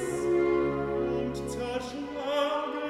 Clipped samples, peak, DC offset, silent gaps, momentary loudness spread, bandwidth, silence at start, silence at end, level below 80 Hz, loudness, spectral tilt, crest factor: under 0.1%; -16 dBFS; under 0.1%; none; 8 LU; 12.5 kHz; 0 s; 0 s; -50 dBFS; -30 LUFS; -5.5 dB/octave; 14 dB